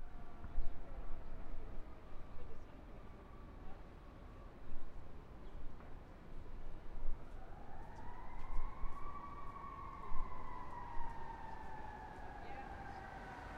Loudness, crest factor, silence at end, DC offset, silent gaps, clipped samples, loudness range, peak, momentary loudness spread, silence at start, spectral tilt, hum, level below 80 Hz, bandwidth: -53 LUFS; 18 dB; 0 s; under 0.1%; none; under 0.1%; 7 LU; -22 dBFS; 8 LU; 0 s; -7 dB/octave; none; -46 dBFS; 4.1 kHz